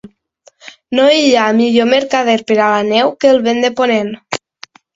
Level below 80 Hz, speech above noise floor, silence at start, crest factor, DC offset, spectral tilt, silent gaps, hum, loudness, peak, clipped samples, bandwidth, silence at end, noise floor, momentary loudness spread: -58 dBFS; 39 dB; 0.05 s; 14 dB; under 0.1%; -4 dB/octave; none; none; -12 LUFS; 0 dBFS; under 0.1%; 7.8 kHz; 0.6 s; -50 dBFS; 10 LU